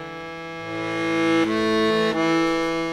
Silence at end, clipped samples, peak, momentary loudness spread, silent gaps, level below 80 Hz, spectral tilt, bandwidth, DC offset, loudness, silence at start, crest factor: 0 s; under 0.1%; -10 dBFS; 13 LU; none; -52 dBFS; -5 dB/octave; 12 kHz; under 0.1%; -21 LUFS; 0 s; 12 dB